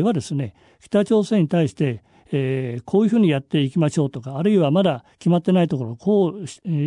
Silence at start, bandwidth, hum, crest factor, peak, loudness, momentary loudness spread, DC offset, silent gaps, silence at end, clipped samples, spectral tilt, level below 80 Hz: 0 s; 11 kHz; none; 14 dB; -6 dBFS; -20 LUFS; 9 LU; under 0.1%; none; 0 s; under 0.1%; -7.5 dB/octave; -62 dBFS